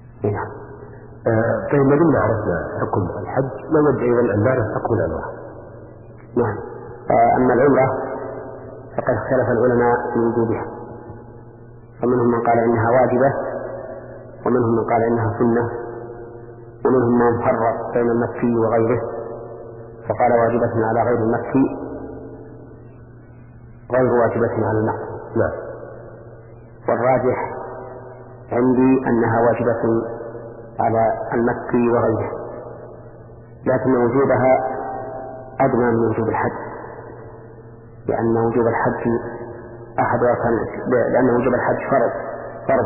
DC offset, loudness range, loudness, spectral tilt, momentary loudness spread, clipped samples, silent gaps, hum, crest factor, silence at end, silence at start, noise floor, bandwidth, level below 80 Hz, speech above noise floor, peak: under 0.1%; 4 LU; -19 LUFS; -13.5 dB/octave; 20 LU; under 0.1%; none; none; 16 dB; 0 s; 0 s; -41 dBFS; 2.9 kHz; -46 dBFS; 24 dB; -4 dBFS